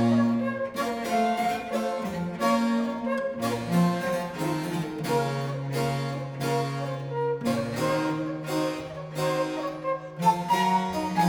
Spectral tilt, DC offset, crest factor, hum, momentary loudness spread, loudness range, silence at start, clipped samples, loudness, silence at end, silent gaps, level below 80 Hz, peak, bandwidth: -6 dB/octave; under 0.1%; 16 dB; none; 7 LU; 2 LU; 0 s; under 0.1%; -27 LUFS; 0 s; none; -60 dBFS; -10 dBFS; over 20 kHz